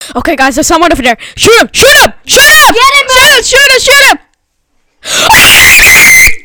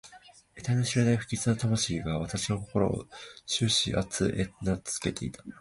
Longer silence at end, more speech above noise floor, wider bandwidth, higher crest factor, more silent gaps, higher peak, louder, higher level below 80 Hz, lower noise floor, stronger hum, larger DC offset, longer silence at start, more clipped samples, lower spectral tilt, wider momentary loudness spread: about the same, 0.05 s vs 0.05 s; first, 53 dB vs 25 dB; first, over 20 kHz vs 11.5 kHz; second, 4 dB vs 18 dB; neither; first, 0 dBFS vs -12 dBFS; first, -2 LUFS vs -29 LUFS; first, -26 dBFS vs -50 dBFS; about the same, -56 dBFS vs -55 dBFS; neither; neither; about the same, 0 s vs 0.05 s; first, 20% vs under 0.1%; second, -1 dB/octave vs -4.5 dB/octave; about the same, 9 LU vs 11 LU